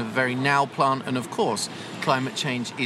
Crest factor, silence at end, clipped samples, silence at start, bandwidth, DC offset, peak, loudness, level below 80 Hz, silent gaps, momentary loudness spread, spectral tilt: 18 dB; 0 s; under 0.1%; 0 s; 15 kHz; under 0.1%; -8 dBFS; -24 LUFS; -70 dBFS; none; 7 LU; -4 dB/octave